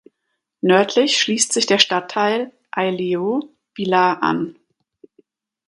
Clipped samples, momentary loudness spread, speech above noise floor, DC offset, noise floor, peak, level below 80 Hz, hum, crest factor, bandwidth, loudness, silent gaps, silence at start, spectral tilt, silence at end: under 0.1%; 11 LU; 58 dB; under 0.1%; -76 dBFS; 0 dBFS; -68 dBFS; none; 20 dB; 11.5 kHz; -18 LUFS; none; 0.65 s; -3 dB/octave; 1.15 s